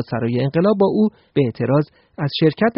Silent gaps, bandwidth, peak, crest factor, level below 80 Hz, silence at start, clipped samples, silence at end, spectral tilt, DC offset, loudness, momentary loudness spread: none; 5.6 kHz; -4 dBFS; 14 dB; -56 dBFS; 0 s; under 0.1%; 0.05 s; -6.5 dB/octave; under 0.1%; -19 LUFS; 7 LU